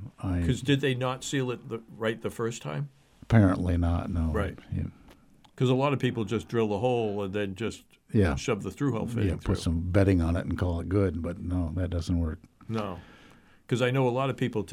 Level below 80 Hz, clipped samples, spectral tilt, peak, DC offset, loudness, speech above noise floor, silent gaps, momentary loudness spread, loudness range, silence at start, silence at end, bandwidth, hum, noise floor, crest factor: -42 dBFS; under 0.1%; -7 dB/octave; -10 dBFS; under 0.1%; -29 LUFS; 29 dB; none; 11 LU; 3 LU; 0 s; 0 s; 14 kHz; none; -56 dBFS; 18 dB